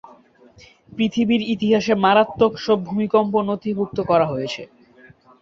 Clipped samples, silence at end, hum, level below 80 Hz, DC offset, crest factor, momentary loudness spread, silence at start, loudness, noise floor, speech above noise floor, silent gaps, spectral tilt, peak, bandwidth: under 0.1%; 0.75 s; none; -56 dBFS; under 0.1%; 18 dB; 8 LU; 0.95 s; -19 LUFS; -50 dBFS; 31 dB; none; -6.5 dB/octave; -2 dBFS; 7.4 kHz